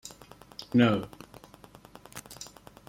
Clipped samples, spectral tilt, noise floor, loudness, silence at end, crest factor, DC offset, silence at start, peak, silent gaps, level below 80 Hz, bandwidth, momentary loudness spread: under 0.1%; -6 dB/octave; -53 dBFS; -26 LUFS; 0.45 s; 24 dB; under 0.1%; 0.05 s; -8 dBFS; none; -62 dBFS; 16.5 kHz; 27 LU